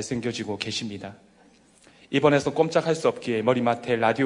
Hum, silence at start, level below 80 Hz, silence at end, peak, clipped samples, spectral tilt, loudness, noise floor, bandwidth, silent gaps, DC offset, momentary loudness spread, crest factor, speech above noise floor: none; 0 s; -62 dBFS; 0 s; -6 dBFS; under 0.1%; -5 dB/octave; -24 LUFS; -57 dBFS; 11 kHz; none; under 0.1%; 10 LU; 20 dB; 33 dB